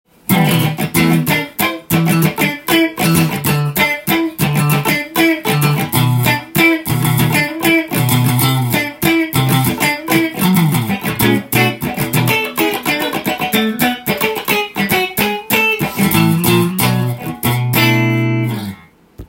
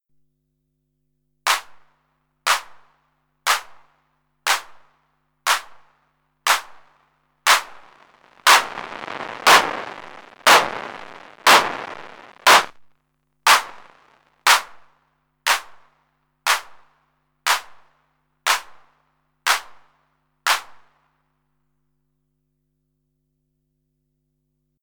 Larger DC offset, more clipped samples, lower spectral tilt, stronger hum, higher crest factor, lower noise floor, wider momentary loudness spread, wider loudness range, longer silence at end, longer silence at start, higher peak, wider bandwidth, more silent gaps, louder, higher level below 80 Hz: neither; neither; first, -5 dB/octave vs 1 dB/octave; second, none vs 50 Hz at -70 dBFS; second, 14 dB vs 20 dB; second, -37 dBFS vs -73 dBFS; second, 5 LU vs 19 LU; second, 2 LU vs 9 LU; second, 0.05 s vs 4.2 s; second, 0.3 s vs 1.45 s; about the same, 0 dBFS vs -2 dBFS; second, 17 kHz vs over 20 kHz; neither; first, -14 LUFS vs -18 LUFS; first, -46 dBFS vs -66 dBFS